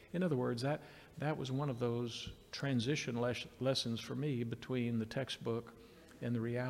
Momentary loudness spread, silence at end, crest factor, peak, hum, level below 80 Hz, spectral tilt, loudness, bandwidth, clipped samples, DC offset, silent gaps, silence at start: 10 LU; 0 s; 16 dB; -24 dBFS; none; -66 dBFS; -6 dB/octave; -39 LUFS; 15.5 kHz; under 0.1%; under 0.1%; none; 0 s